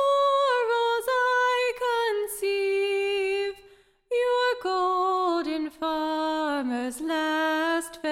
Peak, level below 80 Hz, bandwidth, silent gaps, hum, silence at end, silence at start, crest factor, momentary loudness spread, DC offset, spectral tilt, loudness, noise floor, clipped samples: -14 dBFS; -64 dBFS; 16.5 kHz; none; none; 0 s; 0 s; 12 dB; 7 LU; under 0.1%; -1.5 dB/octave; -25 LUFS; -56 dBFS; under 0.1%